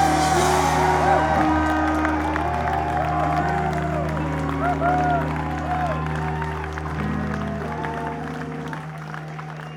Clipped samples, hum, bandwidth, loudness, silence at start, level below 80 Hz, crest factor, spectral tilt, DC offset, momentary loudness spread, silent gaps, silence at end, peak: under 0.1%; none; 17.5 kHz; -23 LUFS; 0 s; -34 dBFS; 18 dB; -5.5 dB/octave; under 0.1%; 12 LU; none; 0 s; -4 dBFS